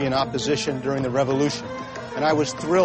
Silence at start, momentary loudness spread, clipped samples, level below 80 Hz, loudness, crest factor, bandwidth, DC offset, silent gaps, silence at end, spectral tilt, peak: 0 s; 10 LU; under 0.1%; -52 dBFS; -24 LUFS; 14 dB; 8.8 kHz; under 0.1%; none; 0 s; -5 dB/octave; -8 dBFS